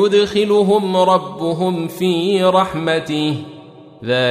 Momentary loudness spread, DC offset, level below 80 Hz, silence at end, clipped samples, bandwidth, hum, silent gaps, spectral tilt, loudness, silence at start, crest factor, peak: 8 LU; under 0.1%; -54 dBFS; 0 s; under 0.1%; 15 kHz; none; none; -6 dB/octave; -16 LUFS; 0 s; 14 dB; -2 dBFS